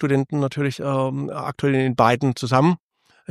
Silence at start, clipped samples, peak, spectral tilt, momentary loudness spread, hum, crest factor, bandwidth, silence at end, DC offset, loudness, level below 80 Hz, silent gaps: 0 s; under 0.1%; -2 dBFS; -7 dB/octave; 8 LU; none; 18 dB; 13 kHz; 0.55 s; under 0.1%; -21 LUFS; -60 dBFS; none